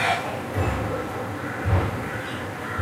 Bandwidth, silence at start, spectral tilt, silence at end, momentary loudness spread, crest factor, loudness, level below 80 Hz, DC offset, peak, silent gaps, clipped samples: 16 kHz; 0 s; -6 dB/octave; 0 s; 6 LU; 16 dB; -27 LUFS; -38 dBFS; under 0.1%; -10 dBFS; none; under 0.1%